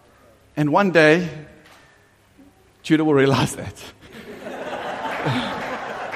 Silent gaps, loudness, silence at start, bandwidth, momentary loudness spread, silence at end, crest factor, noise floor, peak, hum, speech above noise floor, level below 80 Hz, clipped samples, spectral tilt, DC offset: none; -20 LUFS; 0.55 s; 15 kHz; 23 LU; 0 s; 22 dB; -55 dBFS; 0 dBFS; none; 37 dB; -56 dBFS; under 0.1%; -5.5 dB/octave; under 0.1%